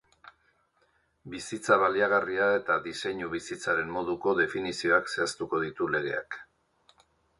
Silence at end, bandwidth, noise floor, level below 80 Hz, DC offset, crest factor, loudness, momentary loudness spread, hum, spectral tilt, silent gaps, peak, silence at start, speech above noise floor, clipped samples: 0.95 s; 11.5 kHz; -70 dBFS; -64 dBFS; under 0.1%; 22 dB; -28 LUFS; 11 LU; none; -4 dB/octave; none; -8 dBFS; 1.25 s; 42 dB; under 0.1%